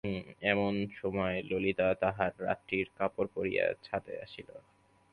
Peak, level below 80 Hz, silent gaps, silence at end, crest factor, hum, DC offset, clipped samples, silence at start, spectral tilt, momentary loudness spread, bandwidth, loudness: -12 dBFS; -60 dBFS; none; 0.55 s; 22 dB; none; under 0.1%; under 0.1%; 0.05 s; -8 dB/octave; 12 LU; 10.5 kHz; -33 LUFS